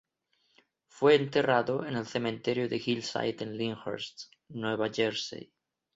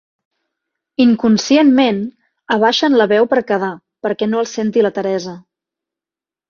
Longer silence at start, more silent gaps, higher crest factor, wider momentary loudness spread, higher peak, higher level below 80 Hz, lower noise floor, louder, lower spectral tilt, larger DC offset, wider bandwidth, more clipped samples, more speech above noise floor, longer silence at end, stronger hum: about the same, 0.95 s vs 1 s; neither; first, 20 dB vs 14 dB; about the same, 14 LU vs 12 LU; second, -10 dBFS vs -2 dBFS; second, -72 dBFS vs -60 dBFS; second, -75 dBFS vs -89 dBFS; second, -30 LUFS vs -15 LUFS; about the same, -5 dB/octave vs -5 dB/octave; neither; about the same, 7.8 kHz vs 7.4 kHz; neither; second, 45 dB vs 75 dB; second, 0.5 s vs 1.1 s; neither